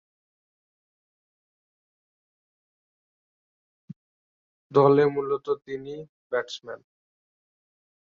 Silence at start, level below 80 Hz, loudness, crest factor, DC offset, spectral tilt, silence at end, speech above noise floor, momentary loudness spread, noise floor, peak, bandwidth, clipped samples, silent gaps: 4.7 s; -74 dBFS; -24 LUFS; 24 dB; under 0.1%; -7 dB/octave; 1.25 s; over 66 dB; 21 LU; under -90 dBFS; -6 dBFS; 7.2 kHz; under 0.1%; 6.09-6.30 s